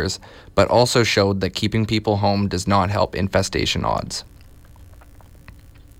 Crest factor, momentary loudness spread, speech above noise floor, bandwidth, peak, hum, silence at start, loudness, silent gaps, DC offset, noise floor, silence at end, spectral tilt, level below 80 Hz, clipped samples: 18 dB; 9 LU; 25 dB; 16 kHz; -4 dBFS; none; 0 s; -20 LUFS; none; under 0.1%; -44 dBFS; 0.2 s; -5 dB/octave; -42 dBFS; under 0.1%